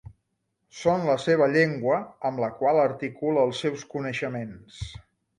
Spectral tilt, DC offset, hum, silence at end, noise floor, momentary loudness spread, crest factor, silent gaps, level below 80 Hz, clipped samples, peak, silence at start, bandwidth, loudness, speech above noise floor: -6 dB/octave; under 0.1%; none; 0.4 s; -77 dBFS; 17 LU; 18 dB; none; -54 dBFS; under 0.1%; -8 dBFS; 0.05 s; 10.5 kHz; -25 LUFS; 52 dB